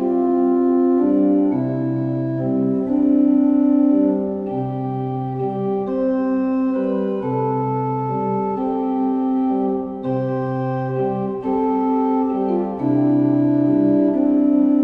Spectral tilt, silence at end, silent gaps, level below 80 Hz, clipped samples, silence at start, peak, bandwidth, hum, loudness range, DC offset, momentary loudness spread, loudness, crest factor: -11.5 dB/octave; 0 s; none; -54 dBFS; under 0.1%; 0 s; -6 dBFS; 3.9 kHz; none; 4 LU; under 0.1%; 7 LU; -19 LUFS; 12 dB